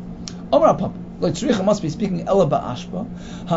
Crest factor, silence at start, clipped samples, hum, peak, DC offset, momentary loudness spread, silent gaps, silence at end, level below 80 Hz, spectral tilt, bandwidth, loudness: 18 dB; 0 s; under 0.1%; none; -2 dBFS; under 0.1%; 15 LU; none; 0 s; -42 dBFS; -6.5 dB/octave; 8 kHz; -20 LUFS